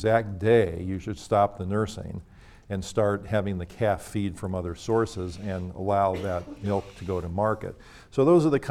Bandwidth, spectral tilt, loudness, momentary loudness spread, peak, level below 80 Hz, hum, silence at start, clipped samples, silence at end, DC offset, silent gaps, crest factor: 14.5 kHz; -7 dB/octave; -27 LUFS; 12 LU; -8 dBFS; -50 dBFS; none; 0 s; under 0.1%; 0 s; under 0.1%; none; 20 dB